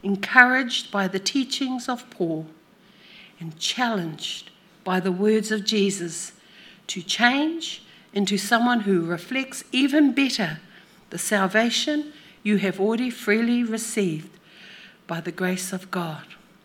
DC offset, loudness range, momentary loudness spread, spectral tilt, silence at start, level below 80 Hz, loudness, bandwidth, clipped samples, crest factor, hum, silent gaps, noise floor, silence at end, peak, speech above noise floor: under 0.1%; 5 LU; 15 LU; -4 dB/octave; 0.05 s; -74 dBFS; -23 LUFS; 17 kHz; under 0.1%; 24 dB; none; none; -53 dBFS; 0.3 s; 0 dBFS; 30 dB